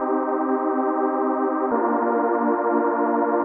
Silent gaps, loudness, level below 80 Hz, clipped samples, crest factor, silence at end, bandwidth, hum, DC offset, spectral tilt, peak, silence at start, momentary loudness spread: none; -22 LUFS; -70 dBFS; under 0.1%; 14 dB; 0 s; 3 kHz; none; under 0.1%; -7 dB/octave; -8 dBFS; 0 s; 2 LU